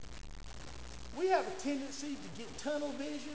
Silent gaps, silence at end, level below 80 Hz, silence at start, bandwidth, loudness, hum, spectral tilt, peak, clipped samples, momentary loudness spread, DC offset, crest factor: none; 0 s; -56 dBFS; 0 s; 8 kHz; -38 LUFS; none; -4 dB/octave; -18 dBFS; under 0.1%; 18 LU; 0.4%; 20 dB